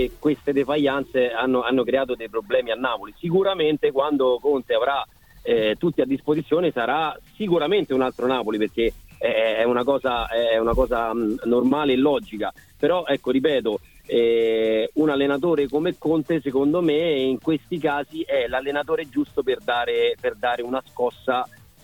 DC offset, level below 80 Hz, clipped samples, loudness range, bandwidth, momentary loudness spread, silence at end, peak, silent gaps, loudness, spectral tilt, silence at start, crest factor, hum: under 0.1%; -46 dBFS; under 0.1%; 2 LU; 18 kHz; 6 LU; 0.35 s; -6 dBFS; none; -22 LUFS; -6.5 dB/octave; 0 s; 16 dB; none